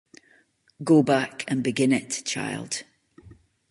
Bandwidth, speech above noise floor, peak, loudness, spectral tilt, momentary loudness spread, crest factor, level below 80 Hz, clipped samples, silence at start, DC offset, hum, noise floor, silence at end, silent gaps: 11.5 kHz; 38 dB; -6 dBFS; -24 LUFS; -4.5 dB/octave; 13 LU; 20 dB; -66 dBFS; under 0.1%; 0.8 s; under 0.1%; none; -62 dBFS; 0.35 s; none